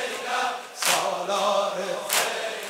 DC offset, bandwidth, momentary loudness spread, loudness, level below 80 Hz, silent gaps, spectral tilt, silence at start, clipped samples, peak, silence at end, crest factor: under 0.1%; 16 kHz; 5 LU; -25 LUFS; -80 dBFS; none; -0.5 dB/octave; 0 s; under 0.1%; -4 dBFS; 0 s; 22 dB